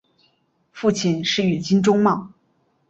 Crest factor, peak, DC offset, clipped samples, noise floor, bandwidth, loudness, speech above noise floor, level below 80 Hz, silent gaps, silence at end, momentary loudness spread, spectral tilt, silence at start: 18 dB; -4 dBFS; under 0.1%; under 0.1%; -65 dBFS; 8 kHz; -20 LUFS; 46 dB; -60 dBFS; none; 0.6 s; 6 LU; -5.5 dB/octave; 0.75 s